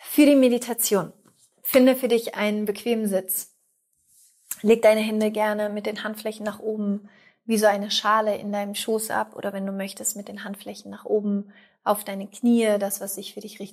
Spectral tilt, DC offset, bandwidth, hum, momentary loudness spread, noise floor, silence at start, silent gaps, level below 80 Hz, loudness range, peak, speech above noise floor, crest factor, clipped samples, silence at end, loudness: -4 dB/octave; under 0.1%; 16 kHz; none; 17 LU; -69 dBFS; 0 s; none; -74 dBFS; 5 LU; -4 dBFS; 46 dB; 18 dB; under 0.1%; 0 s; -23 LUFS